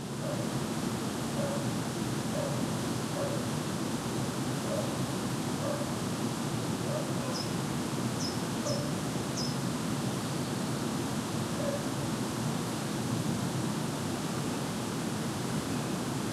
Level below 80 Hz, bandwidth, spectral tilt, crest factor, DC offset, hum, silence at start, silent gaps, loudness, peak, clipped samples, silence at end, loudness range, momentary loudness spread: -58 dBFS; 16 kHz; -5 dB/octave; 14 dB; under 0.1%; none; 0 s; none; -33 LUFS; -18 dBFS; under 0.1%; 0 s; 0 LU; 1 LU